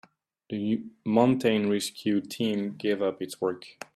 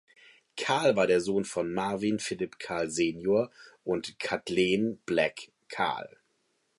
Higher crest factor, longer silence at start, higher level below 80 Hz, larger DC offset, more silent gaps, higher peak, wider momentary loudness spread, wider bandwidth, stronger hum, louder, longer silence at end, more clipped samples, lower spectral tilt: about the same, 20 dB vs 18 dB; about the same, 0.5 s vs 0.55 s; second, -70 dBFS vs -64 dBFS; neither; neither; first, -8 dBFS vs -12 dBFS; second, 9 LU vs 13 LU; first, 14.5 kHz vs 11.5 kHz; neither; about the same, -28 LUFS vs -29 LUFS; second, 0.25 s vs 0.7 s; neither; about the same, -5.5 dB/octave vs -4.5 dB/octave